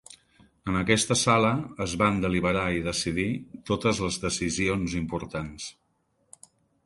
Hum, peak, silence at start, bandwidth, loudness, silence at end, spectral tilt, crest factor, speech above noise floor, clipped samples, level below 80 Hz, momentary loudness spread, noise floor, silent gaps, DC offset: none; -6 dBFS; 0.1 s; 11.5 kHz; -26 LUFS; 1.15 s; -4.5 dB/octave; 22 dB; 45 dB; under 0.1%; -48 dBFS; 13 LU; -71 dBFS; none; under 0.1%